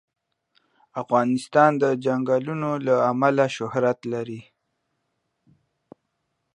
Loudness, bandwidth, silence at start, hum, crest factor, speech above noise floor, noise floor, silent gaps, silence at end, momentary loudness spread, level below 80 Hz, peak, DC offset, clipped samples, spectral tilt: -22 LUFS; 11 kHz; 0.95 s; none; 22 dB; 54 dB; -76 dBFS; none; 2.15 s; 13 LU; -72 dBFS; -4 dBFS; under 0.1%; under 0.1%; -6.5 dB/octave